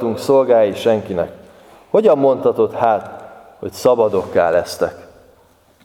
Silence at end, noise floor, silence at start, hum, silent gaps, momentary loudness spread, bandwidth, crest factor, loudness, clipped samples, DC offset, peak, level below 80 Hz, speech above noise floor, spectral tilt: 0.8 s; -52 dBFS; 0 s; none; none; 12 LU; 17 kHz; 16 dB; -16 LUFS; under 0.1%; under 0.1%; 0 dBFS; -54 dBFS; 37 dB; -6 dB/octave